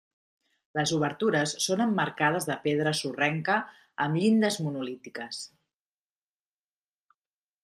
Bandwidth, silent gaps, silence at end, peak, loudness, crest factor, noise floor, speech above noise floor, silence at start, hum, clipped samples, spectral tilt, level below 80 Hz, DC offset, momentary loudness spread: 14.5 kHz; none; 2.2 s; -10 dBFS; -28 LUFS; 20 dB; under -90 dBFS; over 63 dB; 0.75 s; none; under 0.1%; -4.5 dB/octave; -72 dBFS; under 0.1%; 13 LU